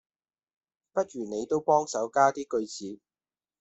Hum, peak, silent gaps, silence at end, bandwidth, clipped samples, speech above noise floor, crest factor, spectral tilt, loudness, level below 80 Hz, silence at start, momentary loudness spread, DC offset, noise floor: none; -8 dBFS; none; 0.65 s; 8.2 kHz; under 0.1%; over 63 dB; 22 dB; -4.5 dB/octave; -28 LUFS; -72 dBFS; 0.95 s; 14 LU; under 0.1%; under -90 dBFS